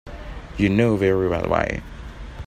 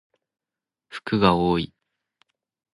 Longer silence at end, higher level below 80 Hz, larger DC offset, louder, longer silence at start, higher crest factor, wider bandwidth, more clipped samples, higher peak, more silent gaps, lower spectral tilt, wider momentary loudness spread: second, 0 s vs 1.1 s; first, -38 dBFS vs -50 dBFS; neither; about the same, -21 LUFS vs -22 LUFS; second, 0.05 s vs 0.9 s; second, 18 dB vs 24 dB; first, 15 kHz vs 11.5 kHz; neither; about the same, -4 dBFS vs -2 dBFS; neither; about the same, -7.5 dB/octave vs -7.5 dB/octave; first, 20 LU vs 17 LU